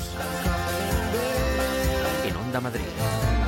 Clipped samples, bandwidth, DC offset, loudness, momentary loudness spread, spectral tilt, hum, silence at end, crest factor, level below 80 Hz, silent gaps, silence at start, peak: under 0.1%; 17 kHz; under 0.1%; -26 LUFS; 4 LU; -5 dB/octave; none; 0 s; 12 dB; -32 dBFS; none; 0 s; -12 dBFS